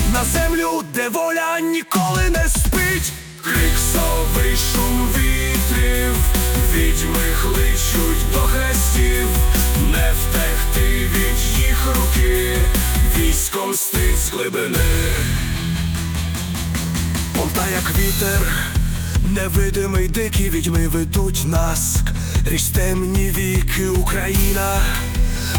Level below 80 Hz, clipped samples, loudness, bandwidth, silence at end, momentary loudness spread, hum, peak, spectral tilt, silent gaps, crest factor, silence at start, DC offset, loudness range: -20 dBFS; under 0.1%; -18 LUFS; 19.5 kHz; 0 s; 4 LU; none; -4 dBFS; -4 dB/octave; none; 12 dB; 0 s; under 0.1%; 2 LU